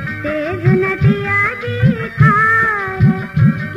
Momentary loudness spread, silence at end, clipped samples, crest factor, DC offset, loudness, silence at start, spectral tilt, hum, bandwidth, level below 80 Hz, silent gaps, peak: 6 LU; 0 s; under 0.1%; 14 dB; under 0.1%; -14 LUFS; 0 s; -8.5 dB/octave; none; 7.2 kHz; -36 dBFS; none; 0 dBFS